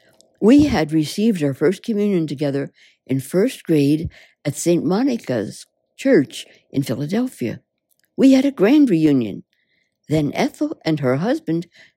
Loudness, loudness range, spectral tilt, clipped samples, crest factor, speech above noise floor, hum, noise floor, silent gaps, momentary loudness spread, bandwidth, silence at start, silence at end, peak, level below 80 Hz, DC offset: -19 LUFS; 3 LU; -6.5 dB/octave; under 0.1%; 16 dB; 49 dB; none; -67 dBFS; none; 14 LU; 16 kHz; 0.4 s; 0.35 s; -2 dBFS; -48 dBFS; under 0.1%